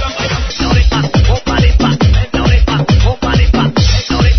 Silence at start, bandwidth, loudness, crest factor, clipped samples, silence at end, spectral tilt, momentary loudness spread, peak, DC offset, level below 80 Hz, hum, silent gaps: 0 s; 6.4 kHz; -12 LUFS; 10 dB; under 0.1%; 0 s; -6 dB/octave; 3 LU; 0 dBFS; 2%; -14 dBFS; none; none